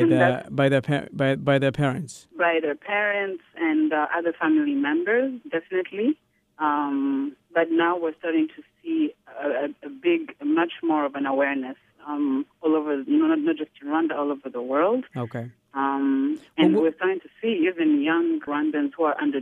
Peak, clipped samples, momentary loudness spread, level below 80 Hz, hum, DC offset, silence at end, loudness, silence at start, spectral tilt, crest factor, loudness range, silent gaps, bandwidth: -6 dBFS; under 0.1%; 9 LU; -68 dBFS; none; under 0.1%; 0 s; -24 LUFS; 0 s; -7 dB/octave; 18 dB; 3 LU; none; 10 kHz